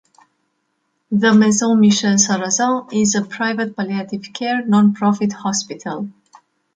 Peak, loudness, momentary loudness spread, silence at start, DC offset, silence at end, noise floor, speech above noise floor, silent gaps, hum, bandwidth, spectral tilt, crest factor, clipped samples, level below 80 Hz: -2 dBFS; -17 LUFS; 13 LU; 1.1 s; under 0.1%; 0.65 s; -69 dBFS; 53 dB; none; none; 9.2 kHz; -4 dB/octave; 16 dB; under 0.1%; -62 dBFS